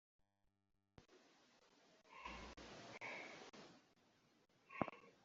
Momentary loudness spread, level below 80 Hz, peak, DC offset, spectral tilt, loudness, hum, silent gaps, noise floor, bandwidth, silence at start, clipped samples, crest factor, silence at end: 17 LU; -74 dBFS; -22 dBFS; under 0.1%; -3 dB/octave; -53 LUFS; none; none; -85 dBFS; 7.6 kHz; 1 s; under 0.1%; 34 dB; 0 s